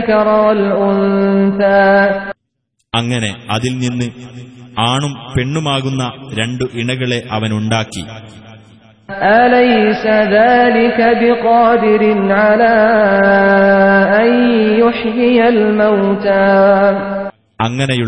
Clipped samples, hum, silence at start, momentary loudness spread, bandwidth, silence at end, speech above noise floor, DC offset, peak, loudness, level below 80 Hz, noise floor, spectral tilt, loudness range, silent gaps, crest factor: under 0.1%; none; 0 s; 11 LU; 10.5 kHz; 0 s; 56 dB; 0.4%; 0 dBFS; -12 LUFS; -46 dBFS; -68 dBFS; -6 dB/octave; 8 LU; none; 12 dB